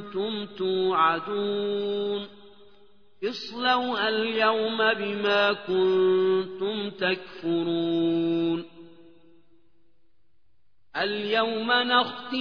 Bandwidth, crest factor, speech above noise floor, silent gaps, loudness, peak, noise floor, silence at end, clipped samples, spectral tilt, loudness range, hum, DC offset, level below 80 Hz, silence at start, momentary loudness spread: 5.4 kHz; 18 dB; 47 dB; none; -25 LUFS; -8 dBFS; -72 dBFS; 0 s; under 0.1%; -6 dB/octave; 7 LU; none; 0.2%; -70 dBFS; 0 s; 9 LU